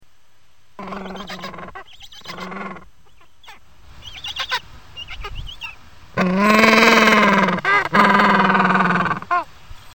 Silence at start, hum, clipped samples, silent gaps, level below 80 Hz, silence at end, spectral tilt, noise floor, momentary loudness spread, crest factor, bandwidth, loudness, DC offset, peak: 0.8 s; none; under 0.1%; none; -44 dBFS; 0.2 s; -4.5 dB/octave; -59 dBFS; 24 LU; 18 dB; 17.5 kHz; -15 LUFS; 0.8%; 0 dBFS